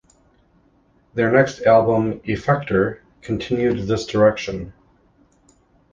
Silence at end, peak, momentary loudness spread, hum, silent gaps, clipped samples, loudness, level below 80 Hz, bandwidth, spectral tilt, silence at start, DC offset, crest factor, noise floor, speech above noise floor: 1.2 s; -2 dBFS; 14 LU; none; none; under 0.1%; -19 LUFS; -48 dBFS; 7.6 kHz; -6.5 dB/octave; 1.15 s; under 0.1%; 18 dB; -58 dBFS; 40 dB